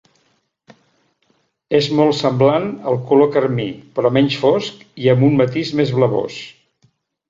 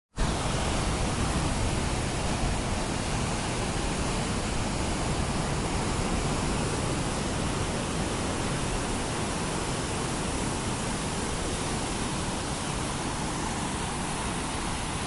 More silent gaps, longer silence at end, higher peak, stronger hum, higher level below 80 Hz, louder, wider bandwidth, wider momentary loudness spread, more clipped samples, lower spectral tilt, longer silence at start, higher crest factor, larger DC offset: neither; first, 0.8 s vs 0 s; first, -2 dBFS vs -16 dBFS; neither; second, -56 dBFS vs -36 dBFS; first, -16 LUFS vs -30 LUFS; second, 7.6 kHz vs 12 kHz; first, 10 LU vs 2 LU; neither; first, -7 dB/octave vs -4 dB/octave; first, 1.7 s vs 0.15 s; about the same, 16 dB vs 14 dB; neither